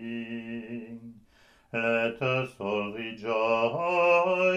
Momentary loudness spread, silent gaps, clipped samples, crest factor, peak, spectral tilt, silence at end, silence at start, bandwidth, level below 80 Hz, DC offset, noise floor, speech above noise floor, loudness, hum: 16 LU; none; under 0.1%; 18 dB; -10 dBFS; -6 dB/octave; 0 s; 0 s; 10 kHz; -68 dBFS; under 0.1%; -60 dBFS; 34 dB; -28 LUFS; none